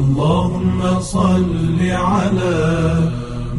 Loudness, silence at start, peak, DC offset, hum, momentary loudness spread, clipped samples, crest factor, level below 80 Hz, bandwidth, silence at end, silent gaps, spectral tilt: -17 LUFS; 0 s; -4 dBFS; under 0.1%; none; 3 LU; under 0.1%; 12 dB; -32 dBFS; 11.5 kHz; 0 s; none; -7 dB/octave